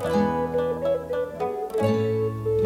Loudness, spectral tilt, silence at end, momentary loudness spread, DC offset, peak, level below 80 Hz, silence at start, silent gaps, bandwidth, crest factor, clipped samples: -25 LUFS; -7.5 dB/octave; 0 s; 5 LU; under 0.1%; -10 dBFS; -48 dBFS; 0 s; none; 16 kHz; 14 dB; under 0.1%